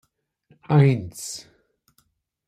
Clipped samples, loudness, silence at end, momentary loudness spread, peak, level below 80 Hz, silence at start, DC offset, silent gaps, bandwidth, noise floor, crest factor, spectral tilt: under 0.1%; -22 LUFS; 1.05 s; 16 LU; -6 dBFS; -60 dBFS; 0.7 s; under 0.1%; none; 14.5 kHz; -67 dBFS; 20 dB; -6.5 dB/octave